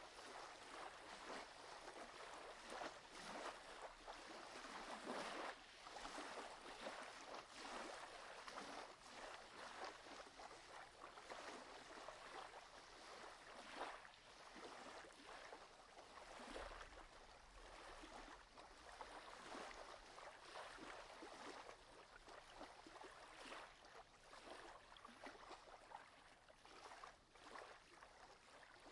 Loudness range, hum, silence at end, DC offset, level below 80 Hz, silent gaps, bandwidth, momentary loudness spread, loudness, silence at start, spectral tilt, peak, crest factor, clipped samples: 7 LU; none; 0 s; under 0.1%; -74 dBFS; none; 12 kHz; 10 LU; -57 LUFS; 0 s; -2 dB/octave; -38 dBFS; 20 dB; under 0.1%